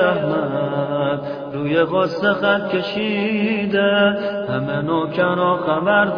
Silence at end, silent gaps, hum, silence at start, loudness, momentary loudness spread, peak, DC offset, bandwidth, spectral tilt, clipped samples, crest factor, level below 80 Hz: 0 s; none; none; 0 s; -19 LUFS; 6 LU; -2 dBFS; under 0.1%; 5.4 kHz; -8 dB/octave; under 0.1%; 16 dB; -56 dBFS